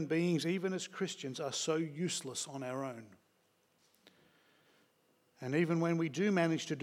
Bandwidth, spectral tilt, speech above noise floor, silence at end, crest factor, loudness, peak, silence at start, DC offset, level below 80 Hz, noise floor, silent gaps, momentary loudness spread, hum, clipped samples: 15 kHz; -5 dB/octave; 39 dB; 0 s; 20 dB; -36 LUFS; -18 dBFS; 0 s; under 0.1%; under -90 dBFS; -74 dBFS; none; 9 LU; none; under 0.1%